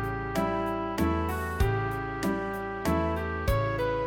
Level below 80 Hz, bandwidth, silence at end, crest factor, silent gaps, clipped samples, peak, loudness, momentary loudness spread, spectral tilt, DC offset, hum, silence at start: -38 dBFS; 18.5 kHz; 0 s; 16 dB; none; under 0.1%; -12 dBFS; -29 LUFS; 3 LU; -6.5 dB/octave; under 0.1%; none; 0 s